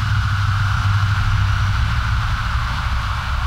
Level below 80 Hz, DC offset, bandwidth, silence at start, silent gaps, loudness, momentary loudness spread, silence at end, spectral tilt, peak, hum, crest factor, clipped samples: -22 dBFS; under 0.1%; 11.5 kHz; 0 s; none; -19 LUFS; 4 LU; 0 s; -5 dB/octave; -6 dBFS; none; 12 dB; under 0.1%